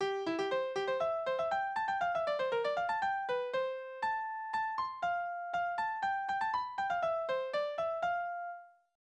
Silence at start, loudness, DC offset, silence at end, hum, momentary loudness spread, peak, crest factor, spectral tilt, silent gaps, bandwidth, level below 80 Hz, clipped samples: 0 s; -35 LUFS; under 0.1%; 0.3 s; none; 4 LU; -22 dBFS; 12 dB; -4 dB/octave; none; 9.2 kHz; -74 dBFS; under 0.1%